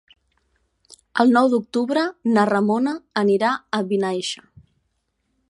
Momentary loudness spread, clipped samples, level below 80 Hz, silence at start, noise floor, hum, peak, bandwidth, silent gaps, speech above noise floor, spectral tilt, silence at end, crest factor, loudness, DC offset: 9 LU; under 0.1%; -68 dBFS; 1.15 s; -72 dBFS; none; -2 dBFS; 11.5 kHz; none; 52 dB; -5.5 dB/octave; 1.15 s; 20 dB; -20 LUFS; under 0.1%